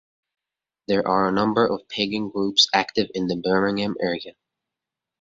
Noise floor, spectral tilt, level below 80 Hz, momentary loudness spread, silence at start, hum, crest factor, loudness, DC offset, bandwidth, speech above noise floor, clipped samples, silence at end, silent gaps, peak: -87 dBFS; -4 dB/octave; -58 dBFS; 9 LU; 0.9 s; none; 20 dB; -22 LUFS; under 0.1%; 7.8 kHz; 64 dB; under 0.1%; 0.9 s; none; -4 dBFS